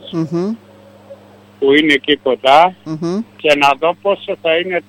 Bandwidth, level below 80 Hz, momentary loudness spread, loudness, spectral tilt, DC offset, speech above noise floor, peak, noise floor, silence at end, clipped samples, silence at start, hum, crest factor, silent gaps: 16.5 kHz; -56 dBFS; 10 LU; -14 LUFS; -5 dB/octave; under 0.1%; 26 dB; 0 dBFS; -40 dBFS; 0.1 s; under 0.1%; 0.05 s; 50 Hz at -45 dBFS; 14 dB; none